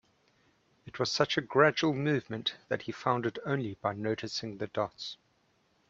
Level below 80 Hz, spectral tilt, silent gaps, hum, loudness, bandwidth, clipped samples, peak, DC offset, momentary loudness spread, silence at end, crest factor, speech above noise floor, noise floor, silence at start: -70 dBFS; -5 dB/octave; none; none; -31 LUFS; 8 kHz; under 0.1%; -10 dBFS; under 0.1%; 11 LU; 0.75 s; 24 dB; 40 dB; -71 dBFS; 0.85 s